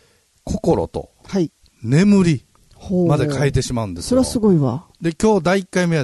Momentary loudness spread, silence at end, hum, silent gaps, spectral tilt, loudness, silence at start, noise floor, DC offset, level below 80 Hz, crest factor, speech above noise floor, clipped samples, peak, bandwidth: 11 LU; 0 s; none; none; -6.5 dB/octave; -18 LUFS; 0.45 s; -37 dBFS; under 0.1%; -40 dBFS; 14 dB; 20 dB; under 0.1%; -4 dBFS; 12.5 kHz